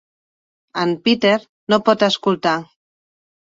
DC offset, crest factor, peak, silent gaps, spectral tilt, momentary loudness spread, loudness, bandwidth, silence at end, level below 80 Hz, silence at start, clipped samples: under 0.1%; 18 dB; -2 dBFS; 1.49-1.67 s; -5 dB/octave; 7 LU; -18 LUFS; 7.8 kHz; 0.95 s; -64 dBFS; 0.75 s; under 0.1%